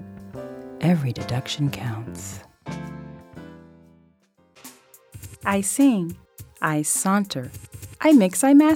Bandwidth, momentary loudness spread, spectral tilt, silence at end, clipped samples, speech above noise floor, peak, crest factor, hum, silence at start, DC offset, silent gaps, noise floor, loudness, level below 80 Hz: 16.5 kHz; 25 LU; -5 dB/octave; 0 s; under 0.1%; 41 dB; -6 dBFS; 18 dB; none; 0 s; under 0.1%; none; -61 dBFS; -21 LUFS; -56 dBFS